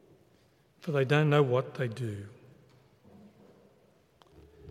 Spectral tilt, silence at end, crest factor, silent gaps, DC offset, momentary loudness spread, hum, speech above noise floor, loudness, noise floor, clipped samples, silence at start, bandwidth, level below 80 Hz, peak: -7.5 dB/octave; 0 s; 24 dB; none; under 0.1%; 19 LU; none; 37 dB; -29 LUFS; -65 dBFS; under 0.1%; 0.85 s; 10.5 kHz; -72 dBFS; -10 dBFS